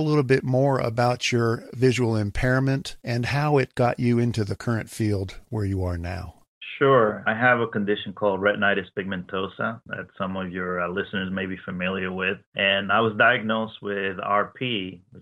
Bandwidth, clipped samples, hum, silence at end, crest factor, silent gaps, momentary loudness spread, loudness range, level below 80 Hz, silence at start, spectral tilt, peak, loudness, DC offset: 13 kHz; under 0.1%; none; 0 s; 20 dB; 6.48-6.61 s, 12.47-12.52 s; 11 LU; 4 LU; -48 dBFS; 0 s; -6 dB/octave; -4 dBFS; -24 LUFS; under 0.1%